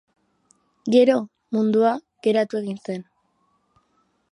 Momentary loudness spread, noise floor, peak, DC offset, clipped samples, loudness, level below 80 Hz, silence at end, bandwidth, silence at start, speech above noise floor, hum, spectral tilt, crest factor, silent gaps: 15 LU; -67 dBFS; -6 dBFS; under 0.1%; under 0.1%; -21 LUFS; -76 dBFS; 1.3 s; 11 kHz; 0.85 s; 48 dB; none; -6.5 dB/octave; 18 dB; none